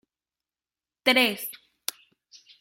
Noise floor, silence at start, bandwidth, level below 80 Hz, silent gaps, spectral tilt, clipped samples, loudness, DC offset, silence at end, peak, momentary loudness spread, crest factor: under -90 dBFS; 1.05 s; 16.5 kHz; -78 dBFS; none; -1.5 dB/octave; under 0.1%; -25 LUFS; under 0.1%; 1.05 s; -4 dBFS; 15 LU; 26 dB